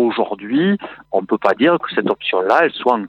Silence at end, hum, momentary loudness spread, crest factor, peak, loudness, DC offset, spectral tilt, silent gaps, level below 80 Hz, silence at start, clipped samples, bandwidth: 0 s; none; 8 LU; 16 dB; 0 dBFS; -17 LUFS; under 0.1%; -7 dB/octave; none; -64 dBFS; 0 s; under 0.1%; 8 kHz